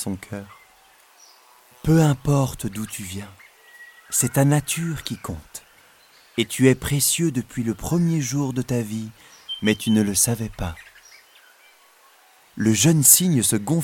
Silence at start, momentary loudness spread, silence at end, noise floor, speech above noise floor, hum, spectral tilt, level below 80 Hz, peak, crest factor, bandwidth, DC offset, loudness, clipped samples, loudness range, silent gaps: 0 s; 17 LU; 0 s; -54 dBFS; 33 dB; none; -4.5 dB/octave; -46 dBFS; 0 dBFS; 22 dB; 17.5 kHz; under 0.1%; -20 LUFS; under 0.1%; 5 LU; none